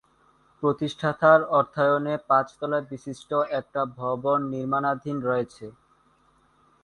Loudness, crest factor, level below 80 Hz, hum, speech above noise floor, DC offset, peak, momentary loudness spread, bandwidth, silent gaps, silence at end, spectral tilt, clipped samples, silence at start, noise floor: -24 LUFS; 22 dB; -66 dBFS; none; 38 dB; under 0.1%; -4 dBFS; 11 LU; 11 kHz; none; 1.1 s; -7 dB/octave; under 0.1%; 0.6 s; -63 dBFS